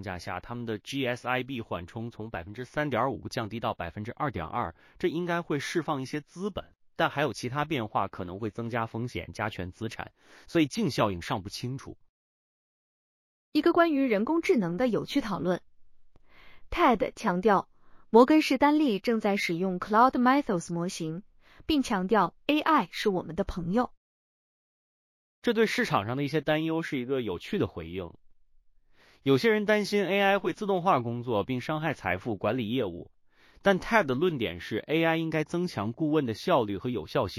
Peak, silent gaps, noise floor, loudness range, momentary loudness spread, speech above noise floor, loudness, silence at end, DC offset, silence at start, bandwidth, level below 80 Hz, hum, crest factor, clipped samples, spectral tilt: -6 dBFS; 12.09-13.52 s, 23.97-25.42 s; -60 dBFS; 8 LU; 12 LU; 32 dB; -28 LUFS; 0 s; under 0.1%; 0 s; 15.5 kHz; -56 dBFS; none; 22 dB; under 0.1%; -6 dB/octave